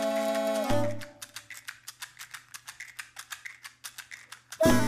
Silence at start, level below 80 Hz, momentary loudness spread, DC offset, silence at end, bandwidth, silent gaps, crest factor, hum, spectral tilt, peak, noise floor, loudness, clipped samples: 0 s; -52 dBFS; 16 LU; under 0.1%; 0 s; 15.5 kHz; none; 24 dB; none; -4.5 dB/octave; -6 dBFS; -49 dBFS; -33 LUFS; under 0.1%